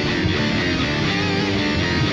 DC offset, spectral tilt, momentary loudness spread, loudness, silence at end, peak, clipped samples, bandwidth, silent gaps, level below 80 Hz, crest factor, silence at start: under 0.1%; -5.5 dB/octave; 0 LU; -20 LUFS; 0 s; -8 dBFS; under 0.1%; 9.6 kHz; none; -36 dBFS; 12 dB; 0 s